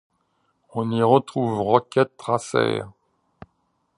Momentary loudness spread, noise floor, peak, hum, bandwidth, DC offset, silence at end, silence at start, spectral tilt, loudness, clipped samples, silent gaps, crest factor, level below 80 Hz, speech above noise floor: 11 LU; -70 dBFS; -2 dBFS; none; 11 kHz; under 0.1%; 1.05 s; 0.75 s; -6.5 dB/octave; -22 LUFS; under 0.1%; none; 22 dB; -62 dBFS; 49 dB